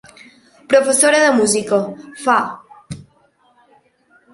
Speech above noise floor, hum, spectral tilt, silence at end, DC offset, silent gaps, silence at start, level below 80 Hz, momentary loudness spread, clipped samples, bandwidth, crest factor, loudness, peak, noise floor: 42 dB; none; -2.5 dB/octave; 1.3 s; under 0.1%; none; 0.7 s; -58 dBFS; 24 LU; under 0.1%; 11.5 kHz; 18 dB; -15 LUFS; 0 dBFS; -56 dBFS